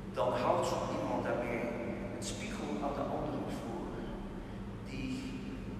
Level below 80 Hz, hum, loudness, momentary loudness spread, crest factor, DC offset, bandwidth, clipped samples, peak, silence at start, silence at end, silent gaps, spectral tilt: -52 dBFS; none; -37 LUFS; 11 LU; 20 dB; under 0.1%; 14 kHz; under 0.1%; -18 dBFS; 0 s; 0 s; none; -5.5 dB/octave